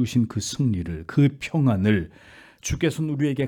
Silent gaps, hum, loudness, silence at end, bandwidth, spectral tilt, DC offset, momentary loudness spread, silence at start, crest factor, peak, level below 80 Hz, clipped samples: none; none; -24 LUFS; 0 s; 17 kHz; -6 dB/octave; under 0.1%; 8 LU; 0 s; 14 dB; -8 dBFS; -46 dBFS; under 0.1%